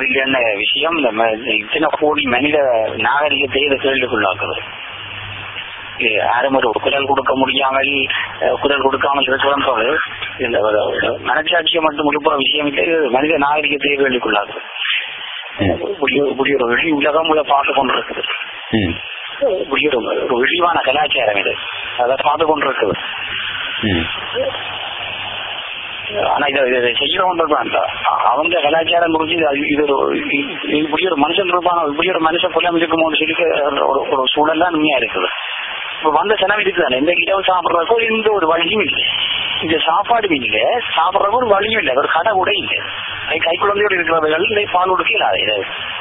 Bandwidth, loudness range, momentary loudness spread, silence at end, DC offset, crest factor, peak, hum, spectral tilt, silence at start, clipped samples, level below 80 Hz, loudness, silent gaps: 4 kHz; 3 LU; 7 LU; 0 s; under 0.1%; 16 dB; 0 dBFS; none; -9.5 dB/octave; 0 s; under 0.1%; -46 dBFS; -15 LUFS; none